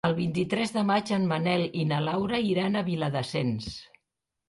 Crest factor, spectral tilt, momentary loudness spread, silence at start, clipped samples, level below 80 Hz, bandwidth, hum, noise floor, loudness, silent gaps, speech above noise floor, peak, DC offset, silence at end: 14 dB; -6.5 dB/octave; 4 LU; 0.05 s; under 0.1%; -58 dBFS; 11.5 kHz; none; -83 dBFS; -27 LUFS; none; 56 dB; -12 dBFS; under 0.1%; 0.65 s